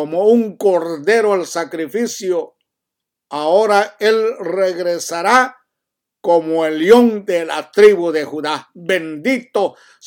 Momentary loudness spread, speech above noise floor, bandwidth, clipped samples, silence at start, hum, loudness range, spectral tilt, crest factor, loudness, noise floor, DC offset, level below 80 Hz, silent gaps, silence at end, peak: 12 LU; 66 dB; 18.5 kHz; under 0.1%; 0 s; none; 4 LU; -4 dB/octave; 16 dB; -16 LUFS; -81 dBFS; under 0.1%; -66 dBFS; none; 0.35 s; 0 dBFS